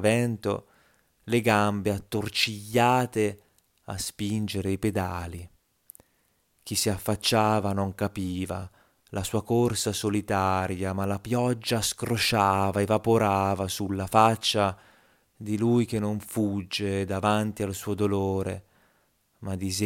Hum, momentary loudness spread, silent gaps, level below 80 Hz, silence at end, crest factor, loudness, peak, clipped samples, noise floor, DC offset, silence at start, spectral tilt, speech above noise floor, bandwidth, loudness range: none; 11 LU; none; -58 dBFS; 0 s; 22 dB; -26 LUFS; -6 dBFS; under 0.1%; -69 dBFS; under 0.1%; 0 s; -5 dB/octave; 43 dB; 17 kHz; 5 LU